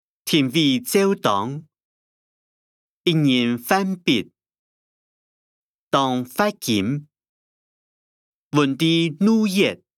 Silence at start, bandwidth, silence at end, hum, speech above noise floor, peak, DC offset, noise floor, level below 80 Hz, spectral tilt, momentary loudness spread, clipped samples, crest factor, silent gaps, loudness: 0.25 s; 18 kHz; 0.2 s; none; over 71 dB; -4 dBFS; under 0.1%; under -90 dBFS; -68 dBFS; -5 dB/octave; 7 LU; under 0.1%; 20 dB; 1.83-3.01 s, 4.59-5.91 s, 7.29-8.50 s; -20 LUFS